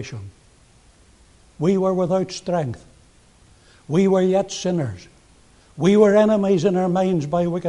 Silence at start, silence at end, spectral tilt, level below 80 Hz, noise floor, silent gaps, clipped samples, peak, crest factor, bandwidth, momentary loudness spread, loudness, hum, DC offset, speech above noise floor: 0 s; 0 s; -7 dB/octave; -54 dBFS; -53 dBFS; none; under 0.1%; -2 dBFS; 18 dB; 11 kHz; 15 LU; -19 LUFS; none; under 0.1%; 34 dB